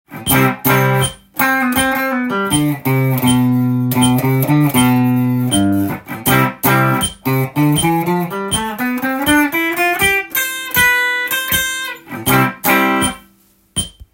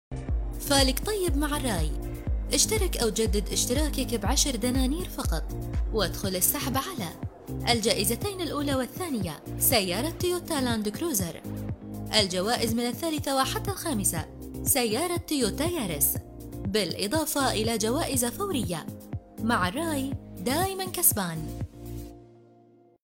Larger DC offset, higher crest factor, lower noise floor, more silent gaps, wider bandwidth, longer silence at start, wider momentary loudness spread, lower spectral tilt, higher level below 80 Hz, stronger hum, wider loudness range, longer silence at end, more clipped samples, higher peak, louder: neither; second, 14 dB vs 24 dB; second, -53 dBFS vs -58 dBFS; neither; about the same, 17 kHz vs 17 kHz; about the same, 0.1 s vs 0.1 s; second, 7 LU vs 12 LU; about the same, -4.5 dB/octave vs -3.5 dB/octave; second, -42 dBFS vs -36 dBFS; neither; about the same, 1 LU vs 2 LU; second, 0.25 s vs 0.8 s; neither; first, 0 dBFS vs -4 dBFS; first, -15 LUFS vs -27 LUFS